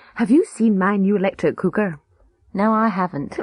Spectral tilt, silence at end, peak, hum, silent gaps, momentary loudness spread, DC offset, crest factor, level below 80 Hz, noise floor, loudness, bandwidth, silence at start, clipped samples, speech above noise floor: -7.5 dB/octave; 0 s; -6 dBFS; none; none; 8 LU; under 0.1%; 14 dB; -56 dBFS; -57 dBFS; -19 LUFS; 10.5 kHz; 0.15 s; under 0.1%; 38 dB